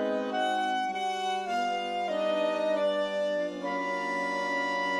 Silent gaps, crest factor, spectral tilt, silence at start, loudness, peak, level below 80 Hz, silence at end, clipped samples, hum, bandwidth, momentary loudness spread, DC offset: none; 12 dB; -3.5 dB/octave; 0 s; -30 LUFS; -18 dBFS; -70 dBFS; 0 s; under 0.1%; none; 12.5 kHz; 3 LU; under 0.1%